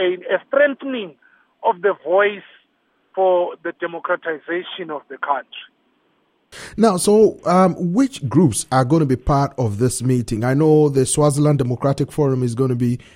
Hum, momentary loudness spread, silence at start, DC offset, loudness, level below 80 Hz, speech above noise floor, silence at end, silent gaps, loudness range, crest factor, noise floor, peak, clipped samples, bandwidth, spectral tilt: none; 13 LU; 0 s; under 0.1%; -18 LUFS; -42 dBFS; 46 dB; 0.2 s; none; 6 LU; 16 dB; -64 dBFS; -2 dBFS; under 0.1%; 16 kHz; -6 dB/octave